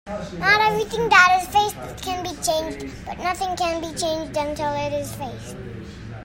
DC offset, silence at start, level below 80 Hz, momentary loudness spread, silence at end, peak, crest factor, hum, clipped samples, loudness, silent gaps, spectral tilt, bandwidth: under 0.1%; 0.05 s; -44 dBFS; 18 LU; 0 s; -2 dBFS; 22 dB; none; under 0.1%; -21 LUFS; none; -3 dB/octave; 16.5 kHz